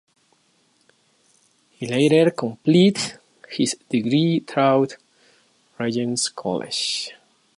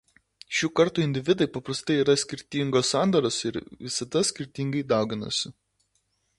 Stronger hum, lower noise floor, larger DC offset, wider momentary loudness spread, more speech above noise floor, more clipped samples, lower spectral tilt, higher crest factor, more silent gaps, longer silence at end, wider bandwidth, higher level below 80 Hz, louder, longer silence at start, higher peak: neither; second, -63 dBFS vs -72 dBFS; neither; about the same, 11 LU vs 9 LU; second, 43 dB vs 47 dB; neither; about the same, -5 dB/octave vs -4.5 dB/octave; about the same, 18 dB vs 18 dB; neither; second, 0.45 s vs 0.9 s; about the same, 11.5 kHz vs 11.5 kHz; second, -68 dBFS vs -62 dBFS; first, -21 LUFS vs -26 LUFS; first, 1.8 s vs 0.5 s; about the same, -6 dBFS vs -8 dBFS